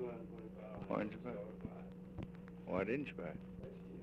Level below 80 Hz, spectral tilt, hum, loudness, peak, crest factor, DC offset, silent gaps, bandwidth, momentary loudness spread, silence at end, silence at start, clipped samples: -64 dBFS; -9 dB/octave; none; -46 LUFS; -24 dBFS; 20 dB; under 0.1%; none; 7.8 kHz; 11 LU; 0 s; 0 s; under 0.1%